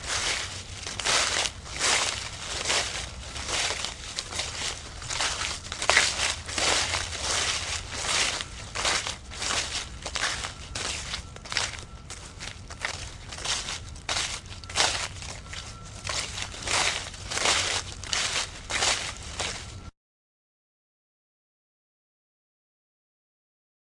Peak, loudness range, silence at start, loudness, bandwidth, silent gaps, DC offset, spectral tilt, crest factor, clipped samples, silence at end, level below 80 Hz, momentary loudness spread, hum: 0 dBFS; 7 LU; 0 s; -27 LUFS; 12 kHz; none; under 0.1%; -0.5 dB/octave; 30 dB; under 0.1%; 4 s; -46 dBFS; 14 LU; none